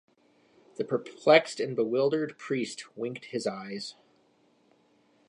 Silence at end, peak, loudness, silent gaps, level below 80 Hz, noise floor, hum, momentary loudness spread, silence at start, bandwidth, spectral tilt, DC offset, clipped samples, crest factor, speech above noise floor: 1.35 s; -6 dBFS; -29 LUFS; none; -84 dBFS; -66 dBFS; none; 16 LU; 0.8 s; 11 kHz; -4.5 dB/octave; under 0.1%; under 0.1%; 24 dB; 38 dB